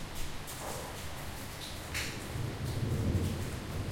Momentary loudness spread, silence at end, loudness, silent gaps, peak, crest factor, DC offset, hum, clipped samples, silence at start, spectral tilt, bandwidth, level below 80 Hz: 9 LU; 0 s; -38 LUFS; none; -20 dBFS; 16 dB; under 0.1%; none; under 0.1%; 0 s; -5 dB/octave; 16.5 kHz; -46 dBFS